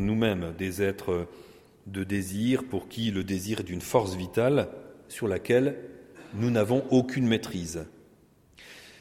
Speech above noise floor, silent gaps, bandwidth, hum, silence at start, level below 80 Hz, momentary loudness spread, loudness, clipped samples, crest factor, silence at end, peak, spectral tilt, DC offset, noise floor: 32 dB; none; 16.5 kHz; none; 0 s; -56 dBFS; 17 LU; -28 LUFS; under 0.1%; 22 dB; 0.1 s; -8 dBFS; -6 dB/octave; under 0.1%; -59 dBFS